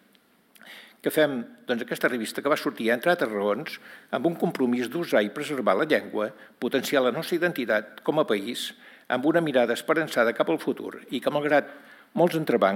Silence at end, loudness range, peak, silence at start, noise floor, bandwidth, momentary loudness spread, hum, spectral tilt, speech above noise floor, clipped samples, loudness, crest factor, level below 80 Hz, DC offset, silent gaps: 0 s; 1 LU; -8 dBFS; 0.65 s; -61 dBFS; 17 kHz; 11 LU; none; -5 dB/octave; 36 dB; under 0.1%; -26 LUFS; 18 dB; -84 dBFS; under 0.1%; none